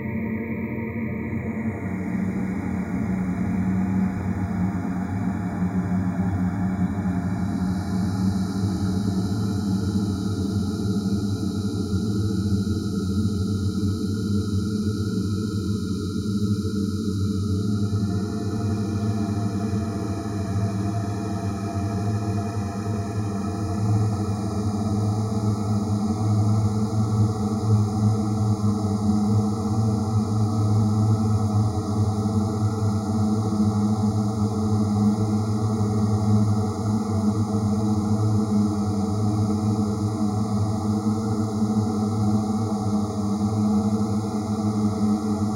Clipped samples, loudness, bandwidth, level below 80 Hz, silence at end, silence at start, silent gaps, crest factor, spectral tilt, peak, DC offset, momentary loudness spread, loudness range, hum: under 0.1%; -24 LUFS; 12.5 kHz; -46 dBFS; 0 s; 0 s; none; 14 dB; -7.5 dB/octave; -8 dBFS; under 0.1%; 5 LU; 3 LU; none